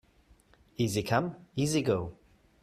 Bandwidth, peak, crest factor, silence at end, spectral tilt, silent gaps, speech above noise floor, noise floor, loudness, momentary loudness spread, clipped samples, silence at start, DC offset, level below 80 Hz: 15 kHz; -12 dBFS; 20 dB; 0.5 s; -5.5 dB/octave; none; 33 dB; -63 dBFS; -31 LUFS; 11 LU; under 0.1%; 0.8 s; under 0.1%; -60 dBFS